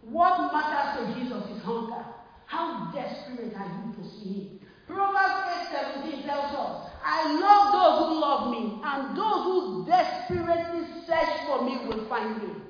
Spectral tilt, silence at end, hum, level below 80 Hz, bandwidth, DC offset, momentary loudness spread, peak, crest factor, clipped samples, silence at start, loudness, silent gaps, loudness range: -6 dB/octave; 0 s; none; -60 dBFS; 5.2 kHz; under 0.1%; 15 LU; -6 dBFS; 22 dB; under 0.1%; 0 s; -27 LUFS; none; 11 LU